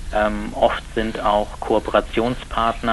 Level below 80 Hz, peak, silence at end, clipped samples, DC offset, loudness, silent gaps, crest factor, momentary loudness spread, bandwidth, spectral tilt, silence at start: -32 dBFS; -2 dBFS; 0 s; under 0.1%; under 0.1%; -21 LUFS; none; 18 dB; 4 LU; 11.5 kHz; -5.5 dB/octave; 0 s